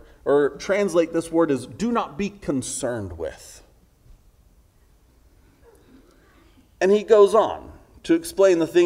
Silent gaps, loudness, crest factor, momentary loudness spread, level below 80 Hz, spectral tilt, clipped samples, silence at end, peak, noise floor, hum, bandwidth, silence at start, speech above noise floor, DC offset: none; -21 LUFS; 20 dB; 16 LU; -52 dBFS; -5 dB/octave; under 0.1%; 0 s; -2 dBFS; -57 dBFS; none; 15.5 kHz; 0.25 s; 36 dB; under 0.1%